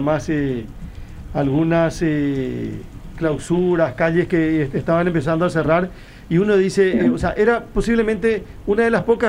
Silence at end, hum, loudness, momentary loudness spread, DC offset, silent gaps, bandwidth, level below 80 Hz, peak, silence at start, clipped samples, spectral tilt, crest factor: 0 s; none; -19 LUFS; 11 LU; under 0.1%; none; 12 kHz; -36 dBFS; -4 dBFS; 0 s; under 0.1%; -7 dB/octave; 14 dB